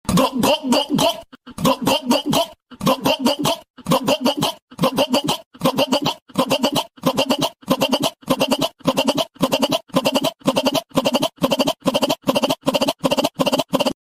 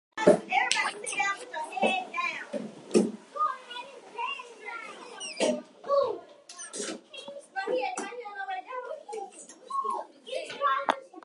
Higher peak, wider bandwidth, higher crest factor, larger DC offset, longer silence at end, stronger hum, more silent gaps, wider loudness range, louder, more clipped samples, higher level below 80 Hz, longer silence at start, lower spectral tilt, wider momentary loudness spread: about the same, -4 dBFS vs -4 dBFS; first, 16 kHz vs 11.5 kHz; second, 16 dB vs 28 dB; neither; about the same, 0.1 s vs 0.05 s; neither; first, 3.70-3.74 s, 4.62-4.68 s, 5.46-5.51 s, 6.22-6.26 s vs none; second, 1 LU vs 7 LU; first, -19 LUFS vs -31 LUFS; neither; first, -50 dBFS vs -80 dBFS; about the same, 0.05 s vs 0.15 s; about the same, -4 dB/octave vs -3 dB/octave; second, 4 LU vs 15 LU